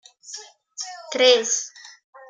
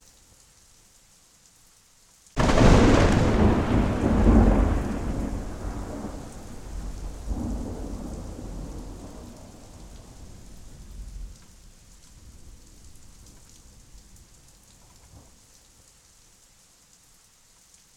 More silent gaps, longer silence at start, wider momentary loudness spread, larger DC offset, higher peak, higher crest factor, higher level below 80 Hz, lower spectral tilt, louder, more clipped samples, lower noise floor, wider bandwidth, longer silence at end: neither; second, 0.3 s vs 2.35 s; second, 21 LU vs 28 LU; neither; about the same, -2 dBFS vs -4 dBFS; about the same, 22 dB vs 22 dB; second, -82 dBFS vs -32 dBFS; second, 1 dB/octave vs -6.5 dB/octave; first, -19 LUFS vs -24 LUFS; neither; second, -42 dBFS vs -57 dBFS; second, 9.8 kHz vs 13.5 kHz; second, 0.45 s vs 2.8 s